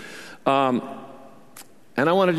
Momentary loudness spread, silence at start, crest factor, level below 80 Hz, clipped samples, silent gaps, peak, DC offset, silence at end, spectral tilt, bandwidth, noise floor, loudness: 22 LU; 0 s; 20 dB; -68 dBFS; under 0.1%; none; -4 dBFS; 0.4%; 0 s; -6 dB/octave; 13.5 kHz; -48 dBFS; -23 LUFS